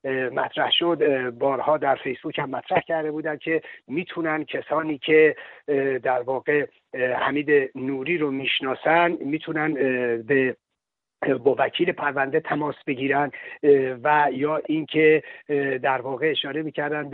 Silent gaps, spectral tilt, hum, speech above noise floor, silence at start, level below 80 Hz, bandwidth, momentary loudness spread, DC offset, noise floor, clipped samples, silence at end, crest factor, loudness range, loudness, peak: none; -2.5 dB/octave; none; 60 dB; 0.05 s; -70 dBFS; 4.2 kHz; 9 LU; under 0.1%; -83 dBFS; under 0.1%; 0 s; 18 dB; 3 LU; -23 LUFS; -4 dBFS